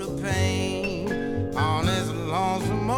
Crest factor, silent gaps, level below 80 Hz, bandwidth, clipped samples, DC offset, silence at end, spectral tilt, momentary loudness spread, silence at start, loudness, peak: 16 dB; none; -44 dBFS; 17.5 kHz; under 0.1%; under 0.1%; 0 s; -5.5 dB/octave; 4 LU; 0 s; -26 LUFS; -10 dBFS